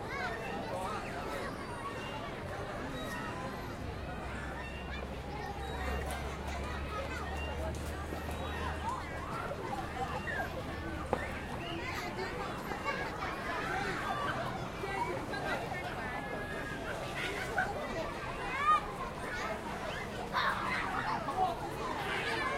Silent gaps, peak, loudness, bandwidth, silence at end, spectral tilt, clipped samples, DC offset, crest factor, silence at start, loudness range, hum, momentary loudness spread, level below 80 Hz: none; -14 dBFS; -37 LUFS; 16.5 kHz; 0 s; -5 dB/octave; under 0.1%; under 0.1%; 24 dB; 0 s; 5 LU; none; 7 LU; -48 dBFS